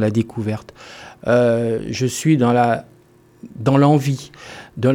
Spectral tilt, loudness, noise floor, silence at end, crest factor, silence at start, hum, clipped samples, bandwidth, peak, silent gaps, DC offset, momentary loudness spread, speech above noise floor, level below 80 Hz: -6.5 dB/octave; -18 LUFS; -51 dBFS; 0 s; 16 dB; 0 s; none; under 0.1%; 16.5 kHz; -2 dBFS; none; under 0.1%; 22 LU; 33 dB; -54 dBFS